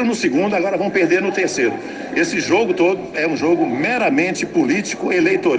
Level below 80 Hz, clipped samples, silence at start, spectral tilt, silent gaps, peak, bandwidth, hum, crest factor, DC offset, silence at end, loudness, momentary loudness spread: -58 dBFS; under 0.1%; 0 s; -4.5 dB/octave; none; -4 dBFS; 9.4 kHz; none; 14 dB; under 0.1%; 0 s; -17 LUFS; 4 LU